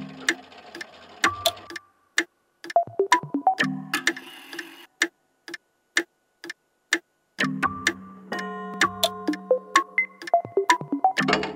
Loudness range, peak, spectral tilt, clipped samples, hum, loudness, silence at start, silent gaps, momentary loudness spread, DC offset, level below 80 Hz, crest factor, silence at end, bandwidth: 5 LU; 0 dBFS; -2.5 dB/octave; under 0.1%; none; -25 LUFS; 0 s; none; 18 LU; under 0.1%; -66 dBFS; 26 dB; 0 s; 16 kHz